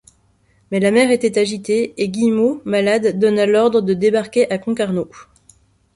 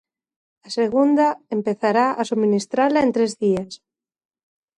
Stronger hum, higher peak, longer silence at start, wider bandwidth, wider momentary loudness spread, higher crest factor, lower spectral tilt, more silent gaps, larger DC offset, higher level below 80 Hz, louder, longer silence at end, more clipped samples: neither; first, -2 dBFS vs -6 dBFS; about the same, 0.7 s vs 0.65 s; about the same, 11.5 kHz vs 11 kHz; about the same, 7 LU vs 8 LU; about the same, 14 dB vs 16 dB; about the same, -5.5 dB/octave vs -5.5 dB/octave; neither; neither; about the same, -58 dBFS vs -62 dBFS; first, -17 LUFS vs -20 LUFS; second, 0.75 s vs 1 s; neither